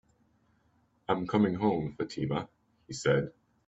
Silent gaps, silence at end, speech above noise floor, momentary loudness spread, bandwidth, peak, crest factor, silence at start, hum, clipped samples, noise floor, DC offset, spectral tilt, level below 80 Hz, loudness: none; 0.35 s; 40 dB; 15 LU; 8 kHz; -10 dBFS; 22 dB; 1.1 s; none; under 0.1%; -70 dBFS; under 0.1%; -6.5 dB/octave; -62 dBFS; -31 LUFS